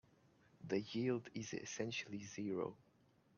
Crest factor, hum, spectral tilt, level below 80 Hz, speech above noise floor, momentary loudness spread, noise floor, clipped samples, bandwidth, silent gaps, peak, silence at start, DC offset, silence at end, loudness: 18 dB; none; -5 dB/octave; -80 dBFS; 30 dB; 7 LU; -73 dBFS; under 0.1%; 7.4 kHz; none; -26 dBFS; 0.6 s; under 0.1%; 0.6 s; -44 LUFS